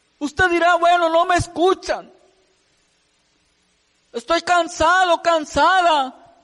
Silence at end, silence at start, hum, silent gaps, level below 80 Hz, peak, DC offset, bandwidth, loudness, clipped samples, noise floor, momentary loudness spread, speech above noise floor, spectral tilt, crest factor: 0.35 s; 0.2 s; none; none; -46 dBFS; -6 dBFS; under 0.1%; 11.5 kHz; -17 LUFS; under 0.1%; -63 dBFS; 13 LU; 46 dB; -3.5 dB/octave; 14 dB